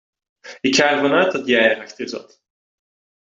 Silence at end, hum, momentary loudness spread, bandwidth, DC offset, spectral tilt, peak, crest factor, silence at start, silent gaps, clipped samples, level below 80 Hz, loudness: 1 s; none; 14 LU; 7.8 kHz; under 0.1%; -3 dB/octave; -2 dBFS; 18 dB; 0.45 s; none; under 0.1%; -66 dBFS; -17 LUFS